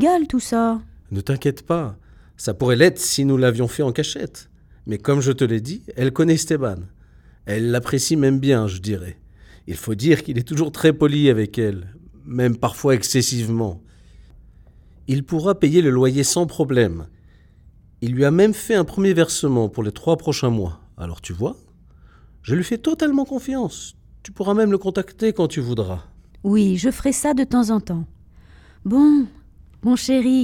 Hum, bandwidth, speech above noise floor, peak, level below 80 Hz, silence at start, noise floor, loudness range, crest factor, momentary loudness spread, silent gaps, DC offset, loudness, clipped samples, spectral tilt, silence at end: none; 18 kHz; 31 dB; -2 dBFS; -46 dBFS; 0 s; -50 dBFS; 4 LU; 18 dB; 14 LU; none; under 0.1%; -20 LUFS; under 0.1%; -5.5 dB/octave; 0 s